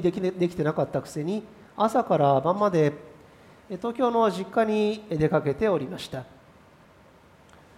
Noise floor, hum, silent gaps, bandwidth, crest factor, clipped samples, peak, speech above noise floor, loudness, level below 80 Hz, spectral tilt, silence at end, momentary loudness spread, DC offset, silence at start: -54 dBFS; none; none; 15 kHz; 18 dB; under 0.1%; -8 dBFS; 30 dB; -25 LUFS; -58 dBFS; -7 dB/octave; 1.55 s; 12 LU; under 0.1%; 0 s